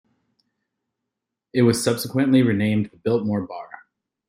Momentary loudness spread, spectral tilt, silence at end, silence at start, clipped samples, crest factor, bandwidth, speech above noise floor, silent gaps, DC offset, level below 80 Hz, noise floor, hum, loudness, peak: 14 LU; -6 dB/octave; 0.65 s; 1.55 s; under 0.1%; 18 dB; 16 kHz; 63 dB; none; under 0.1%; -62 dBFS; -83 dBFS; none; -21 LUFS; -4 dBFS